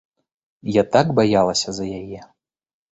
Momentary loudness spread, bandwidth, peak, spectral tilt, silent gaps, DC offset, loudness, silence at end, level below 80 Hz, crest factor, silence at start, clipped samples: 17 LU; 8.4 kHz; -2 dBFS; -5 dB/octave; none; under 0.1%; -19 LUFS; 0.65 s; -52 dBFS; 18 dB; 0.65 s; under 0.1%